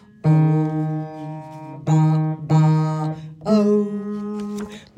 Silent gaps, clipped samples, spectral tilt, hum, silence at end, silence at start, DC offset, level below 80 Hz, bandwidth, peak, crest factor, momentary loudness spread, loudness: none; under 0.1%; -9 dB/octave; none; 0.15 s; 0.25 s; under 0.1%; -60 dBFS; 8 kHz; -6 dBFS; 14 dB; 15 LU; -20 LUFS